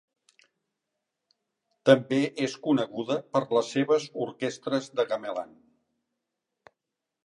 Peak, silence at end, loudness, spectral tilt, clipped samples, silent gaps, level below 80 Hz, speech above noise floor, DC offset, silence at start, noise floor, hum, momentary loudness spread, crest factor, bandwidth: -4 dBFS; 1.8 s; -27 LUFS; -5.5 dB/octave; under 0.1%; none; -80 dBFS; 60 dB; under 0.1%; 1.85 s; -86 dBFS; none; 11 LU; 26 dB; 11 kHz